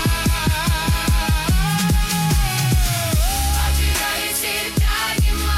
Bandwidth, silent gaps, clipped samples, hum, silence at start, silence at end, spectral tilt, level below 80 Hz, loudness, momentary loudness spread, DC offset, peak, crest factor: 16.5 kHz; none; under 0.1%; none; 0 s; 0 s; -3.5 dB/octave; -22 dBFS; -19 LUFS; 1 LU; under 0.1%; -8 dBFS; 10 dB